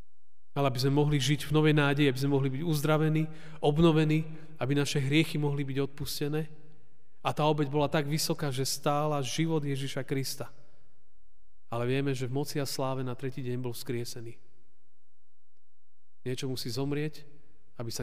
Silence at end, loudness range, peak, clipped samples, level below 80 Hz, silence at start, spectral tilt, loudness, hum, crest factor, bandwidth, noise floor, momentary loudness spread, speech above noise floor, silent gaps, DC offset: 0 s; 11 LU; -12 dBFS; under 0.1%; -56 dBFS; 0.55 s; -5.5 dB/octave; -30 LUFS; none; 18 dB; 15.5 kHz; -87 dBFS; 12 LU; 58 dB; none; 1%